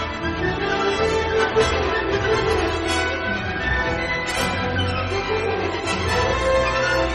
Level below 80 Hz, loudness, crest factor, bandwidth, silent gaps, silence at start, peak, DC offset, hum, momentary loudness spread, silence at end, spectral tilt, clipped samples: -34 dBFS; -21 LUFS; 16 dB; 11.5 kHz; none; 0 s; -6 dBFS; under 0.1%; none; 4 LU; 0 s; -4.5 dB/octave; under 0.1%